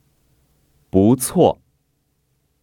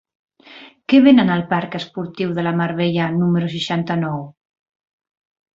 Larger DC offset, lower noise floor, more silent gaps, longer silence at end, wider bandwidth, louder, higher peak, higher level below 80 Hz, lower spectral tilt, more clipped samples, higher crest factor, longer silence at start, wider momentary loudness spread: neither; first, -67 dBFS vs -43 dBFS; neither; second, 1.1 s vs 1.25 s; first, 19 kHz vs 7.6 kHz; about the same, -17 LUFS vs -18 LUFS; about the same, 0 dBFS vs -2 dBFS; first, -52 dBFS vs -58 dBFS; about the same, -6.5 dB/octave vs -7.5 dB/octave; neither; about the same, 20 dB vs 18 dB; first, 0.95 s vs 0.5 s; second, 7 LU vs 15 LU